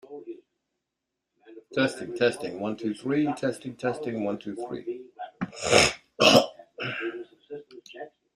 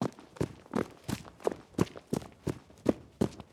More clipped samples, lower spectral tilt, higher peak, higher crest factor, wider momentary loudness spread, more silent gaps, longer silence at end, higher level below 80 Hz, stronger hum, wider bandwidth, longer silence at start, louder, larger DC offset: neither; second, -3.5 dB/octave vs -6.5 dB/octave; first, -2 dBFS vs -10 dBFS; about the same, 26 dB vs 26 dB; first, 23 LU vs 6 LU; neither; first, 0.25 s vs 0.1 s; about the same, -60 dBFS vs -56 dBFS; neither; second, 14 kHz vs 16.5 kHz; about the same, 0.1 s vs 0 s; first, -26 LUFS vs -36 LUFS; neither